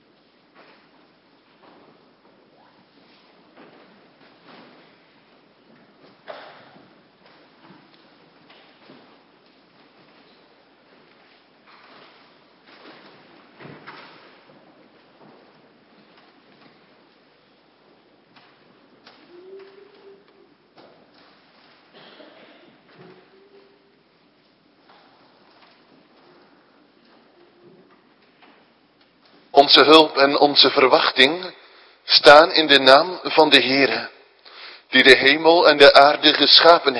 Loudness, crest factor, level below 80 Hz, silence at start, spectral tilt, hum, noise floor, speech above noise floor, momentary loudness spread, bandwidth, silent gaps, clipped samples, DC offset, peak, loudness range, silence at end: -13 LUFS; 22 dB; -64 dBFS; 29.55 s; -3 dB/octave; none; -58 dBFS; 45 dB; 25 LU; 11 kHz; none; under 0.1%; under 0.1%; 0 dBFS; 4 LU; 0 s